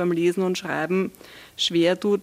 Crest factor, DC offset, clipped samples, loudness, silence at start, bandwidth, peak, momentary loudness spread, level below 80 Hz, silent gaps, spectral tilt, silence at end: 16 dB; under 0.1%; under 0.1%; -23 LUFS; 0 s; 15.5 kHz; -8 dBFS; 7 LU; -66 dBFS; none; -5 dB/octave; 0 s